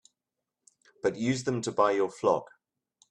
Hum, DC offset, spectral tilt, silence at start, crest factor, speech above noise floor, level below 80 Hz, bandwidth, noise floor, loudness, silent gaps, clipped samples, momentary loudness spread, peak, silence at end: none; under 0.1%; -5.5 dB/octave; 1.05 s; 22 dB; 60 dB; -70 dBFS; 10.5 kHz; -88 dBFS; -29 LUFS; none; under 0.1%; 6 LU; -10 dBFS; 0.65 s